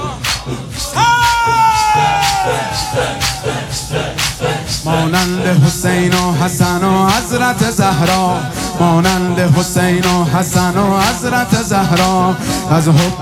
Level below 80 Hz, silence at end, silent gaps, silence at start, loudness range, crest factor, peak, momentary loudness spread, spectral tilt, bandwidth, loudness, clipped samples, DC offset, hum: -34 dBFS; 0 s; none; 0 s; 2 LU; 12 dB; 0 dBFS; 7 LU; -4.5 dB/octave; 17 kHz; -13 LUFS; under 0.1%; under 0.1%; none